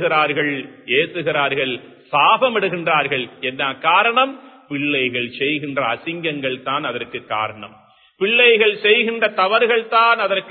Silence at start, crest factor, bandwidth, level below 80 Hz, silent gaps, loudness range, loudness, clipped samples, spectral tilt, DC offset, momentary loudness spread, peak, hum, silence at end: 0 s; 18 dB; 4.5 kHz; -66 dBFS; none; 6 LU; -17 LUFS; under 0.1%; -9 dB/octave; under 0.1%; 10 LU; 0 dBFS; none; 0 s